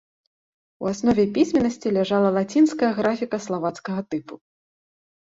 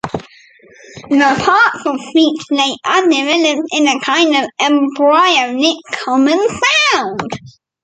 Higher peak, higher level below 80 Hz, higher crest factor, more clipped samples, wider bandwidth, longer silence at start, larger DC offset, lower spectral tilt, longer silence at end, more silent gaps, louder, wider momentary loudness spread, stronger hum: second, -6 dBFS vs 0 dBFS; second, -58 dBFS vs -52 dBFS; about the same, 16 dB vs 12 dB; neither; second, 8 kHz vs 9.2 kHz; first, 0.8 s vs 0.05 s; neither; first, -6 dB/octave vs -3 dB/octave; first, 0.9 s vs 0.35 s; neither; second, -22 LUFS vs -13 LUFS; about the same, 10 LU vs 10 LU; neither